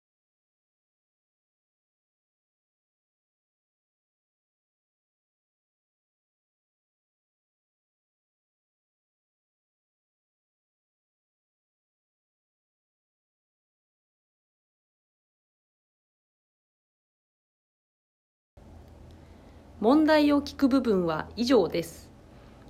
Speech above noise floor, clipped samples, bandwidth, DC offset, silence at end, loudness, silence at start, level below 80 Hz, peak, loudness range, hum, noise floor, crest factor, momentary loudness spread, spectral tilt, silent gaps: 28 dB; under 0.1%; 15 kHz; under 0.1%; 0.7 s; -24 LUFS; 19.8 s; -60 dBFS; -10 dBFS; 5 LU; none; -51 dBFS; 24 dB; 10 LU; -6 dB/octave; none